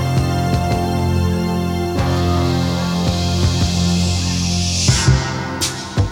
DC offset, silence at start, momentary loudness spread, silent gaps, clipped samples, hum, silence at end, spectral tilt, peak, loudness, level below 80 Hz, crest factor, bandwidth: under 0.1%; 0 s; 5 LU; none; under 0.1%; none; 0 s; -5 dB/octave; -2 dBFS; -17 LUFS; -30 dBFS; 16 dB; 17.5 kHz